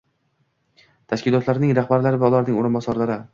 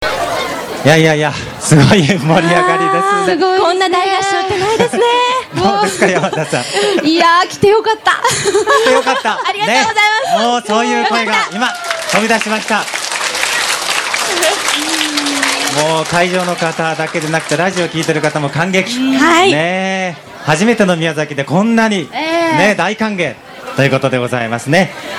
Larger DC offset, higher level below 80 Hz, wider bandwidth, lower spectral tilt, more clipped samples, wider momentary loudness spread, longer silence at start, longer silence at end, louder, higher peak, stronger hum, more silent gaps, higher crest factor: neither; second, -58 dBFS vs -48 dBFS; second, 7.4 kHz vs 18 kHz; first, -8.5 dB/octave vs -4 dB/octave; second, under 0.1% vs 0.2%; about the same, 6 LU vs 7 LU; first, 1.1 s vs 0 s; about the same, 0.05 s vs 0 s; second, -20 LUFS vs -12 LUFS; second, -4 dBFS vs 0 dBFS; neither; neither; about the same, 16 dB vs 12 dB